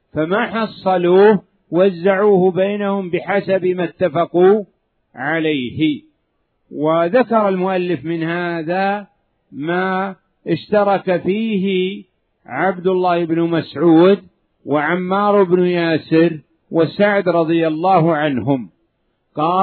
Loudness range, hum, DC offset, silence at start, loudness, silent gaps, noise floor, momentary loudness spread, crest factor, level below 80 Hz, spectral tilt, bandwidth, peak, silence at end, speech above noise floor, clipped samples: 4 LU; none; under 0.1%; 0.15 s; -16 LUFS; none; -67 dBFS; 9 LU; 16 dB; -62 dBFS; -10.5 dB/octave; 4.5 kHz; 0 dBFS; 0 s; 51 dB; under 0.1%